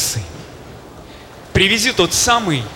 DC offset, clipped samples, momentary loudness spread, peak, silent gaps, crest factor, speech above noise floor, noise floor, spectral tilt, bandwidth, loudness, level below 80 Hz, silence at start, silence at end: under 0.1%; under 0.1%; 23 LU; -2 dBFS; none; 16 dB; 21 dB; -37 dBFS; -2.5 dB/octave; 19 kHz; -14 LUFS; -38 dBFS; 0 s; 0 s